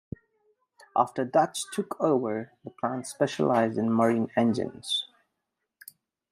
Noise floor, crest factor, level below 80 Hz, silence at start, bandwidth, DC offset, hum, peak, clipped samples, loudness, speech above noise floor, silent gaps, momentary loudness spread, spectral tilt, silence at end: -83 dBFS; 20 dB; -70 dBFS; 0.95 s; 15.5 kHz; under 0.1%; none; -8 dBFS; under 0.1%; -27 LUFS; 56 dB; none; 10 LU; -5 dB/octave; 1.25 s